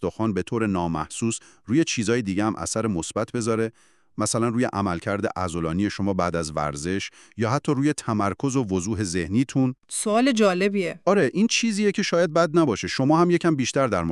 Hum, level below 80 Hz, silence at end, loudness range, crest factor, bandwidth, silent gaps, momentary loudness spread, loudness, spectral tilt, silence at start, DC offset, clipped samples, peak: none; -52 dBFS; 0 s; 5 LU; 16 dB; 12.5 kHz; none; 7 LU; -23 LUFS; -5 dB/octave; 0 s; under 0.1%; under 0.1%; -6 dBFS